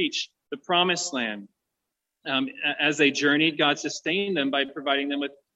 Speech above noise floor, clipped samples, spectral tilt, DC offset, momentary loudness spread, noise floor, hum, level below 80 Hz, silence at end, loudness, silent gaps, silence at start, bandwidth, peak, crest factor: 58 dB; under 0.1%; -3 dB/octave; under 0.1%; 10 LU; -84 dBFS; none; -76 dBFS; 0.25 s; -24 LUFS; none; 0 s; 8.2 kHz; -8 dBFS; 18 dB